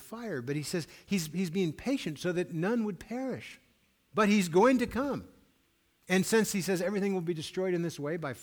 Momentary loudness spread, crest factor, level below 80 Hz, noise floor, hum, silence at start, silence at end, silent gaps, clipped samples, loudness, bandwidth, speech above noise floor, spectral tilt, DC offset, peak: 12 LU; 18 dB; -62 dBFS; -71 dBFS; none; 0 s; 0 s; none; under 0.1%; -31 LUFS; 19.5 kHz; 40 dB; -5 dB/octave; under 0.1%; -14 dBFS